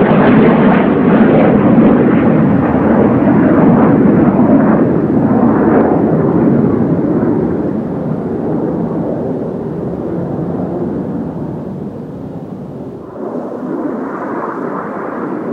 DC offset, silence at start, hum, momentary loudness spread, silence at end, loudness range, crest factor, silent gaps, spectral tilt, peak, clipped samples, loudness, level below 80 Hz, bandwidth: under 0.1%; 0 s; none; 14 LU; 0 s; 13 LU; 12 dB; none; -10.5 dB/octave; 0 dBFS; under 0.1%; -12 LUFS; -38 dBFS; 4.3 kHz